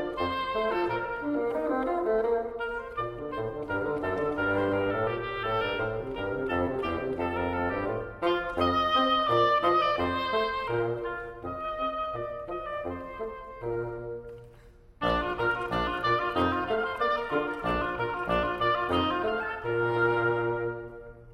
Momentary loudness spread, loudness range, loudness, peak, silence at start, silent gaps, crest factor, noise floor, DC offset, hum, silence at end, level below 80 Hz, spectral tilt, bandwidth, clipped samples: 11 LU; 7 LU; -29 LUFS; -12 dBFS; 0 s; none; 16 dB; -53 dBFS; under 0.1%; none; 0 s; -50 dBFS; -7 dB/octave; 15.5 kHz; under 0.1%